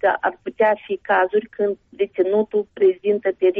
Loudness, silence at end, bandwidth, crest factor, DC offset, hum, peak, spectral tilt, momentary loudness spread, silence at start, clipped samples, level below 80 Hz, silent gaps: -20 LUFS; 0 s; 3.8 kHz; 12 dB; under 0.1%; none; -6 dBFS; -3.5 dB/octave; 7 LU; 0.05 s; under 0.1%; -64 dBFS; none